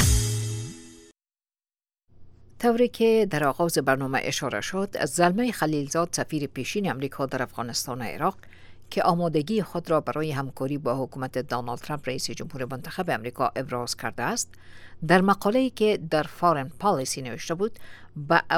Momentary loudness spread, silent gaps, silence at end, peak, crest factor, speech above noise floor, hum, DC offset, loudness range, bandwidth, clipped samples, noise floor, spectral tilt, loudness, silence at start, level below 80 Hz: 10 LU; none; 0 s; -4 dBFS; 22 dB; over 64 dB; none; under 0.1%; 6 LU; 17.5 kHz; under 0.1%; under -90 dBFS; -4.5 dB/octave; -26 LUFS; 0 s; -42 dBFS